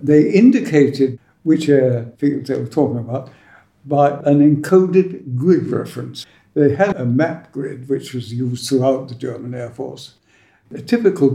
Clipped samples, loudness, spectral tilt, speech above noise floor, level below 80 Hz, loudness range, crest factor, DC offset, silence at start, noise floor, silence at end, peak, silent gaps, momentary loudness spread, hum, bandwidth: under 0.1%; -17 LUFS; -7.5 dB/octave; 39 dB; -60 dBFS; 6 LU; 16 dB; under 0.1%; 0 s; -55 dBFS; 0 s; -2 dBFS; none; 15 LU; none; 14 kHz